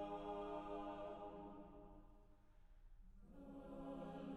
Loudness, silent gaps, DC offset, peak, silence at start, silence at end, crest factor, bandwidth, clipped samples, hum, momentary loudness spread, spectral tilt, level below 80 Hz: -53 LUFS; none; under 0.1%; -38 dBFS; 0 s; 0 s; 14 dB; 12 kHz; under 0.1%; none; 17 LU; -7.5 dB/octave; -66 dBFS